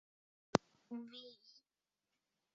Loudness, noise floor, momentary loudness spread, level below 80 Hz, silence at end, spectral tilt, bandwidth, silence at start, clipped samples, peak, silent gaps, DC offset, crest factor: -42 LUFS; under -90 dBFS; 20 LU; -78 dBFS; 1.25 s; -4.5 dB/octave; 7.4 kHz; 0.55 s; under 0.1%; -8 dBFS; none; under 0.1%; 38 dB